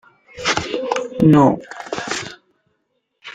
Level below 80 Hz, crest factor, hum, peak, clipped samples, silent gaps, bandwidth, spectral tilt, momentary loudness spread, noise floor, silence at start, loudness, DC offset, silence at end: -50 dBFS; 18 dB; none; -2 dBFS; under 0.1%; none; 9.4 kHz; -5.5 dB/octave; 15 LU; -70 dBFS; 0.35 s; -18 LUFS; under 0.1%; 0.05 s